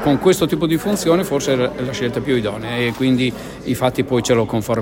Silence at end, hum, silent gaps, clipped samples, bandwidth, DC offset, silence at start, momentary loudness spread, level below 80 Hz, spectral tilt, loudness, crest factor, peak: 0 s; none; none; under 0.1%; 16.5 kHz; under 0.1%; 0 s; 6 LU; -44 dBFS; -5.5 dB/octave; -18 LUFS; 16 dB; -2 dBFS